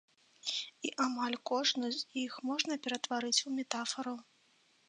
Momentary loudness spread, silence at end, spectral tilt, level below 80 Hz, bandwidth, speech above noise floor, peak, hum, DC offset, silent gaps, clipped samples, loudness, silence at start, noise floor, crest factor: 9 LU; 0.65 s; -1 dB/octave; -90 dBFS; 10 kHz; 34 dB; -14 dBFS; none; under 0.1%; none; under 0.1%; -35 LUFS; 0.45 s; -70 dBFS; 22 dB